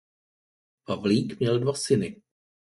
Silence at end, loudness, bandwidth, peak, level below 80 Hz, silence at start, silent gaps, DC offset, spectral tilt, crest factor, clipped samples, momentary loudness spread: 0.55 s; -26 LUFS; 11.5 kHz; -10 dBFS; -60 dBFS; 0.9 s; none; under 0.1%; -6 dB/octave; 18 dB; under 0.1%; 8 LU